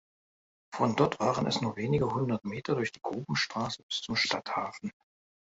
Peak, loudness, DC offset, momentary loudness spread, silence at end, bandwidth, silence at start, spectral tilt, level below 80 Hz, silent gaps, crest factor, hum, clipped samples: -10 dBFS; -31 LUFS; under 0.1%; 9 LU; 0.6 s; 8 kHz; 0.7 s; -5 dB/octave; -62 dBFS; 3.83-3.89 s; 22 dB; none; under 0.1%